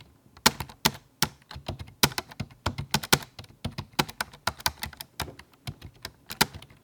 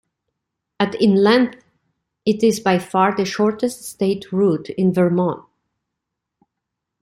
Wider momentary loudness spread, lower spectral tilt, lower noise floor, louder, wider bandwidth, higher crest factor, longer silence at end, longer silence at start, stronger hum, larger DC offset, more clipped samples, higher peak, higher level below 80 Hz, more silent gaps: first, 18 LU vs 8 LU; second, -2.5 dB/octave vs -6 dB/octave; second, -45 dBFS vs -81 dBFS; second, -28 LUFS vs -18 LUFS; first, 19 kHz vs 15.5 kHz; first, 30 dB vs 18 dB; second, 0.2 s vs 1.65 s; second, 0 s vs 0.8 s; neither; neither; neither; about the same, 0 dBFS vs -2 dBFS; first, -50 dBFS vs -60 dBFS; neither